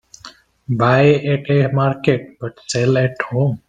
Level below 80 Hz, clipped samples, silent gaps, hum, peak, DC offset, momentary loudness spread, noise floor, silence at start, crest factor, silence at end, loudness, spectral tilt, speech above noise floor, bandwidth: -54 dBFS; under 0.1%; none; none; 0 dBFS; under 0.1%; 10 LU; -43 dBFS; 0.25 s; 16 dB; 0.1 s; -17 LUFS; -6.5 dB/octave; 26 dB; 9.2 kHz